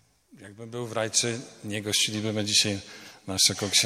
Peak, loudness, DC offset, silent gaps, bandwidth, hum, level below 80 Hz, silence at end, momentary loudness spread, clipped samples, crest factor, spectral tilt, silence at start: -6 dBFS; -25 LUFS; under 0.1%; none; 16 kHz; none; -68 dBFS; 0 s; 17 LU; under 0.1%; 22 dB; -2 dB/octave; 0.35 s